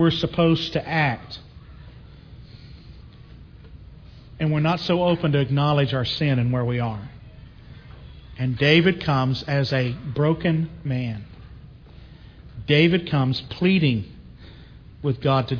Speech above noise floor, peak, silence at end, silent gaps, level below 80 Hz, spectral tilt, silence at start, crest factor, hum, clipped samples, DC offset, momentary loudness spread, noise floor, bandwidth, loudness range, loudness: 23 dB; -4 dBFS; 0 s; none; -46 dBFS; -7.5 dB/octave; 0 s; 20 dB; none; under 0.1%; under 0.1%; 21 LU; -44 dBFS; 5.4 kHz; 7 LU; -22 LUFS